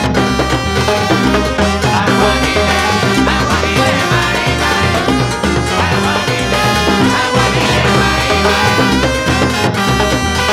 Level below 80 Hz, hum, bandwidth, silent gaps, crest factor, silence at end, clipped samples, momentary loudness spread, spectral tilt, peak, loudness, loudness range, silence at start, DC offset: -26 dBFS; none; 16 kHz; none; 12 dB; 0 s; under 0.1%; 3 LU; -4.5 dB/octave; 0 dBFS; -12 LUFS; 1 LU; 0 s; under 0.1%